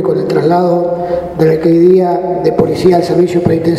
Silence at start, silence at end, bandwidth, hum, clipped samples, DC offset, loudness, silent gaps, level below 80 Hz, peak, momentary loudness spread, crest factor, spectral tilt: 0 s; 0 s; 12.5 kHz; none; 0.2%; under 0.1%; -11 LUFS; none; -40 dBFS; 0 dBFS; 6 LU; 10 dB; -8 dB/octave